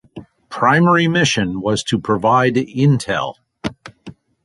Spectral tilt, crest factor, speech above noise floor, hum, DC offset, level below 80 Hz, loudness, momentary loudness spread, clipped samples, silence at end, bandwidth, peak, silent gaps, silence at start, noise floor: -5.5 dB/octave; 16 dB; 25 dB; none; under 0.1%; -48 dBFS; -16 LUFS; 15 LU; under 0.1%; 0.3 s; 11.5 kHz; -2 dBFS; none; 0.15 s; -40 dBFS